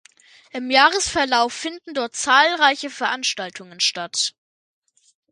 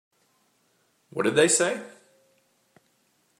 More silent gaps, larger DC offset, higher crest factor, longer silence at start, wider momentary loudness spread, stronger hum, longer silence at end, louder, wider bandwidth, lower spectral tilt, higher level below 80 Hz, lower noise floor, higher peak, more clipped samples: neither; neither; about the same, 22 dB vs 24 dB; second, 0.55 s vs 1.15 s; second, 14 LU vs 18 LU; neither; second, 1.05 s vs 1.5 s; first, -19 LUFS vs -23 LUFS; second, 11.5 kHz vs 16 kHz; second, -0.5 dB/octave vs -2.5 dB/octave; first, -58 dBFS vs -76 dBFS; second, -51 dBFS vs -68 dBFS; first, 0 dBFS vs -6 dBFS; neither